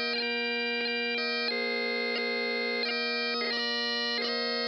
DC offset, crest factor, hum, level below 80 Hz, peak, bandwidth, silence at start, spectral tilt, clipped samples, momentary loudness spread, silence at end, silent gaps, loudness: under 0.1%; 12 dB; none; under -90 dBFS; -18 dBFS; 10 kHz; 0 s; -2 dB/octave; under 0.1%; 1 LU; 0 s; none; -29 LUFS